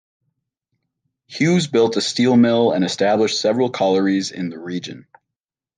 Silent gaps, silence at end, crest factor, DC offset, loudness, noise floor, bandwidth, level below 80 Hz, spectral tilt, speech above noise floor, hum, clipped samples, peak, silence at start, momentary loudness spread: none; 0.75 s; 14 dB; under 0.1%; -18 LUFS; -86 dBFS; 9.8 kHz; -68 dBFS; -5 dB/octave; 68 dB; none; under 0.1%; -4 dBFS; 1.3 s; 14 LU